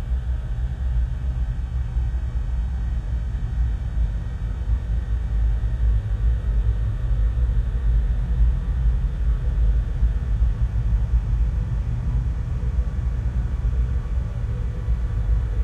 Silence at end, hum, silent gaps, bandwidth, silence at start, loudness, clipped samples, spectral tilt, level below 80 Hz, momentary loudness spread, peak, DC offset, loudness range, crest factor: 0 s; none; none; 3.9 kHz; 0 s; -25 LUFS; under 0.1%; -8.5 dB/octave; -22 dBFS; 4 LU; -8 dBFS; under 0.1%; 3 LU; 12 dB